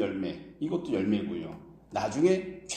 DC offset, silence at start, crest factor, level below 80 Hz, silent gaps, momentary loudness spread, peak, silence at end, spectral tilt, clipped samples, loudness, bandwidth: under 0.1%; 0 s; 18 dB; -62 dBFS; none; 12 LU; -12 dBFS; 0 s; -5.5 dB/octave; under 0.1%; -30 LUFS; 9.6 kHz